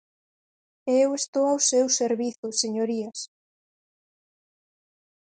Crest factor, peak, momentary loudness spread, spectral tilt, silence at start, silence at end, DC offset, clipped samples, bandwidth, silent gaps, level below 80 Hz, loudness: 18 dB; -10 dBFS; 14 LU; -2 dB/octave; 0.85 s; 2.05 s; under 0.1%; under 0.1%; 9.4 kHz; 1.28-1.33 s, 2.38-2.43 s; -80 dBFS; -24 LUFS